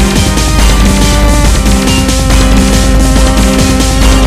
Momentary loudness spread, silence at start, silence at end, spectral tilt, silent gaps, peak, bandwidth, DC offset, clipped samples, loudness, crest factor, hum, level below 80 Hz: 1 LU; 0 s; 0 s; -4.5 dB/octave; none; 0 dBFS; 15.5 kHz; 0.6%; 1%; -8 LUFS; 6 dB; none; -8 dBFS